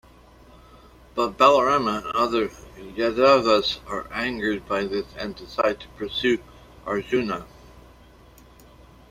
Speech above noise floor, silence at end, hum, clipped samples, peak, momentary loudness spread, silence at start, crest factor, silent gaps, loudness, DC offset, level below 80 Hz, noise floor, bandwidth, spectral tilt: 28 dB; 1.3 s; none; under 0.1%; -2 dBFS; 16 LU; 1.15 s; 22 dB; none; -23 LUFS; under 0.1%; -50 dBFS; -50 dBFS; 15 kHz; -4.5 dB/octave